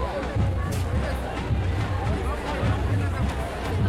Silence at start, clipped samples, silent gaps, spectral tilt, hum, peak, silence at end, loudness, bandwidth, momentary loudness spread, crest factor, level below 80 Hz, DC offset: 0 s; under 0.1%; none; -7 dB/octave; none; -12 dBFS; 0 s; -27 LUFS; 14 kHz; 3 LU; 14 dB; -32 dBFS; under 0.1%